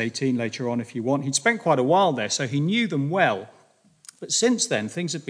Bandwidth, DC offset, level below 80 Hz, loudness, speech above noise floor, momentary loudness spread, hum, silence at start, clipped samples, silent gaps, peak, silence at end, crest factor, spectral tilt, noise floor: 10.5 kHz; under 0.1%; -76 dBFS; -23 LUFS; 34 dB; 8 LU; none; 0 s; under 0.1%; none; -6 dBFS; 0.05 s; 18 dB; -4 dB/octave; -57 dBFS